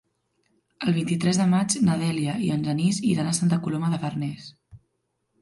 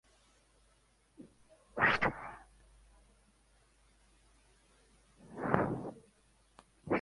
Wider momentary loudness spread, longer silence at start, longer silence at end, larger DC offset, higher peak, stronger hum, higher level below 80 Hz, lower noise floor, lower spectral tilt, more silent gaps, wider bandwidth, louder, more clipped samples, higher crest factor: second, 9 LU vs 29 LU; second, 0.8 s vs 1.2 s; first, 0.65 s vs 0 s; neither; about the same, -10 dBFS vs -8 dBFS; neither; about the same, -62 dBFS vs -62 dBFS; first, -75 dBFS vs -70 dBFS; about the same, -5.5 dB/octave vs -6.5 dB/octave; neither; about the same, 11.5 kHz vs 11.5 kHz; first, -24 LUFS vs -34 LUFS; neither; second, 16 dB vs 32 dB